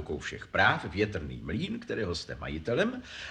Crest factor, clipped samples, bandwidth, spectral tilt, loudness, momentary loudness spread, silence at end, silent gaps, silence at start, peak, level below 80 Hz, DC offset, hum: 22 dB; under 0.1%; 10.5 kHz; -5.5 dB/octave; -31 LUFS; 11 LU; 0 s; none; 0 s; -10 dBFS; -50 dBFS; under 0.1%; none